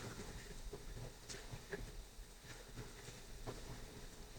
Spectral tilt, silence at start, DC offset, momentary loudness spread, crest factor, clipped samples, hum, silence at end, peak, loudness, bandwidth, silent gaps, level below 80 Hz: -4 dB/octave; 0 s; under 0.1%; 5 LU; 18 dB; under 0.1%; none; 0 s; -32 dBFS; -53 LUFS; 19 kHz; none; -56 dBFS